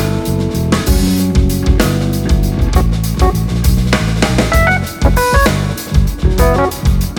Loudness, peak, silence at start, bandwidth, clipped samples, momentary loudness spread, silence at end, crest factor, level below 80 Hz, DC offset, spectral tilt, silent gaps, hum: -13 LUFS; 0 dBFS; 0 s; 19 kHz; under 0.1%; 4 LU; 0 s; 12 dB; -16 dBFS; under 0.1%; -5.5 dB/octave; none; none